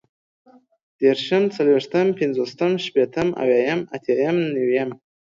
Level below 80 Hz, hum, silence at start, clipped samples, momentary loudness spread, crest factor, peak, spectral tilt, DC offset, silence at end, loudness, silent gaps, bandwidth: -64 dBFS; none; 1 s; under 0.1%; 5 LU; 16 dB; -4 dBFS; -6.5 dB/octave; under 0.1%; 0.45 s; -21 LUFS; none; 7.6 kHz